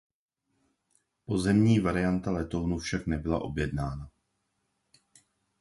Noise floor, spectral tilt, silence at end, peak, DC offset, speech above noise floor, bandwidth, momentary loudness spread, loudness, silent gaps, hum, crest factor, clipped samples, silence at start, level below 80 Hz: -78 dBFS; -7 dB/octave; 1.5 s; -12 dBFS; under 0.1%; 50 dB; 11.5 kHz; 11 LU; -29 LUFS; none; none; 18 dB; under 0.1%; 1.3 s; -46 dBFS